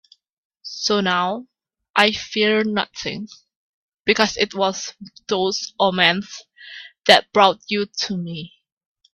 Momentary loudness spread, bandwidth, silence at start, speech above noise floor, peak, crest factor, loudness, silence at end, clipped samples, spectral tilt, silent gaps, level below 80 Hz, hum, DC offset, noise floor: 21 LU; 14 kHz; 0.65 s; 21 dB; 0 dBFS; 22 dB; -19 LUFS; 0.65 s; under 0.1%; -3.5 dB/octave; 1.90-1.94 s, 3.56-4.04 s; -60 dBFS; none; under 0.1%; -41 dBFS